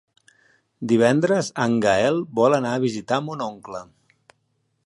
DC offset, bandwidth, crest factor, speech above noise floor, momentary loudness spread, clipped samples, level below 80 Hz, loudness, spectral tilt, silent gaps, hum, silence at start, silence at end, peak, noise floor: under 0.1%; 11.5 kHz; 18 dB; 50 dB; 16 LU; under 0.1%; -62 dBFS; -21 LUFS; -5.5 dB/octave; none; none; 0.8 s; 1 s; -4 dBFS; -70 dBFS